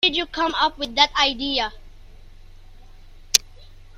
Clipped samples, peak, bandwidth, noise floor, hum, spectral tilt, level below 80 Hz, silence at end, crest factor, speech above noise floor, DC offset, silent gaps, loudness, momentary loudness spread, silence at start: under 0.1%; 0 dBFS; 16 kHz; -43 dBFS; none; 0 dB/octave; -42 dBFS; 0 s; 24 dB; 21 dB; under 0.1%; none; -20 LUFS; 7 LU; 0 s